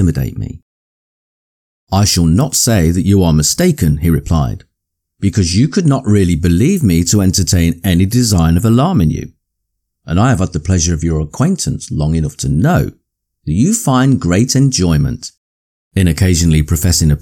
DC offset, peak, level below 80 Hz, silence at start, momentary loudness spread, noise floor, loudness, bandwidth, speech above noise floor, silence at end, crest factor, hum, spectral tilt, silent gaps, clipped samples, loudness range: under 0.1%; -2 dBFS; -26 dBFS; 0 s; 8 LU; -74 dBFS; -13 LUFS; 18.5 kHz; 62 dB; 0 s; 12 dB; none; -5.5 dB/octave; 0.63-1.87 s, 15.37-15.91 s; under 0.1%; 3 LU